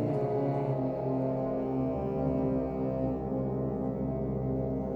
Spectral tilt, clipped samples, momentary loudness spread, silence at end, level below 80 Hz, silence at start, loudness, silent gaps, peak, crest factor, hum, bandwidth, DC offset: -11.5 dB/octave; under 0.1%; 3 LU; 0 s; -46 dBFS; 0 s; -32 LUFS; none; -18 dBFS; 12 dB; none; 5 kHz; under 0.1%